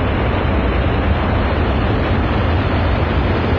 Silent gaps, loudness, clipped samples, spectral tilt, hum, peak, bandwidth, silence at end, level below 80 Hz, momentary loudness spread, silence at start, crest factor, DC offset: none; -17 LUFS; under 0.1%; -9 dB/octave; none; -4 dBFS; 5.4 kHz; 0 s; -22 dBFS; 0 LU; 0 s; 12 dB; under 0.1%